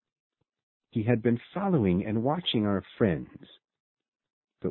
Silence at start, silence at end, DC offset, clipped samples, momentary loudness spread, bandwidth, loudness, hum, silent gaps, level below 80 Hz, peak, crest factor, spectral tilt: 0.95 s; 0 s; under 0.1%; under 0.1%; 10 LU; 4.3 kHz; -28 LUFS; none; 3.80-3.97 s, 4.08-4.12 s, 4.33-4.42 s; -54 dBFS; -10 dBFS; 20 dB; -11 dB/octave